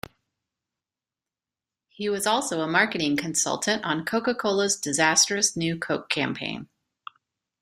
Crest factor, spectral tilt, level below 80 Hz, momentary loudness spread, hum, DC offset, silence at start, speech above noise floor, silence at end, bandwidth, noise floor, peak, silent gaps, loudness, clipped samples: 22 dB; -2.5 dB/octave; -66 dBFS; 10 LU; none; under 0.1%; 2 s; over 65 dB; 0.95 s; 15.5 kHz; under -90 dBFS; -6 dBFS; none; -24 LUFS; under 0.1%